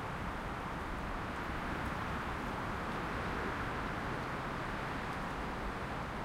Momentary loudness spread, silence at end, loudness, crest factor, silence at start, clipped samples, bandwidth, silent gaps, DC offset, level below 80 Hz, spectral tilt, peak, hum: 3 LU; 0 s; -39 LUFS; 14 dB; 0 s; under 0.1%; 16.5 kHz; none; under 0.1%; -48 dBFS; -5.5 dB/octave; -26 dBFS; none